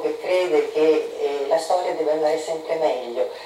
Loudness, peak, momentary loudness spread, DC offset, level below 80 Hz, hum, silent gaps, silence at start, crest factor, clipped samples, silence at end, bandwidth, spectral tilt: -22 LUFS; -6 dBFS; 6 LU; under 0.1%; -72 dBFS; none; none; 0 s; 14 dB; under 0.1%; 0 s; 14 kHz; -3.5 dB/octave